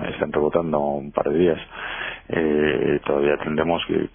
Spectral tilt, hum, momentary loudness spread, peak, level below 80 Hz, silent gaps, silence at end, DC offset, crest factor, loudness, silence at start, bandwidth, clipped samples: -10.5 dB/octave; none; 8 LU; -4 dBFS; -46 dBFS; none; 0.05 s; under 0.1%; 18 dB; -22 LUFS; 0 s; 3.6 kHz; under 0.1%